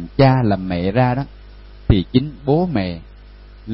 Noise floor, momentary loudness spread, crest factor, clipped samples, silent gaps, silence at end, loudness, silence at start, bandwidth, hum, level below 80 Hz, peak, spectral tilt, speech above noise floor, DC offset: -40 dBFS; 18 LU; 18 dB; under 0.1%; none; 0 s; -18 LUFS; 0 s; 5.8 kHz; 50 Hz at -35 dBFS; -32 dBFS; 0 dBFS; -12.5 dB/octave; 23 dB; under 0.1%